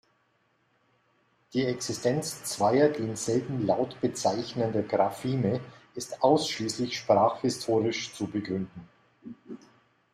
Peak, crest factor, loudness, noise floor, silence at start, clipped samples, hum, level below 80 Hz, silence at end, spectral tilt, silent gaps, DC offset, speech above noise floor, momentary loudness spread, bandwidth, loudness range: -8 dBFS; 20 dB; -28 LUFS; -70 dBFS; 1.55 s; under 0.1%; none; -66 dBFS; 0.6 s; -5 dB/octave; none; under 0.1%; 43 dB; 16 LU; 14 kHz; 2 LU